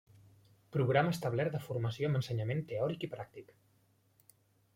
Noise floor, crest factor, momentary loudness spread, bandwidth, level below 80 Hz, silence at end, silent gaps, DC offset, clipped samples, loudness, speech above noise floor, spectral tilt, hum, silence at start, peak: -71 dBFS; 22 dB; 13 LU; 16.5 kHz; -70 dBFS; 1.3 s; none; under 0.1%; under 0.1%; -35 LUFS; 37 dB; -7 dB/octave; none; 0.7 s; -14 dBFS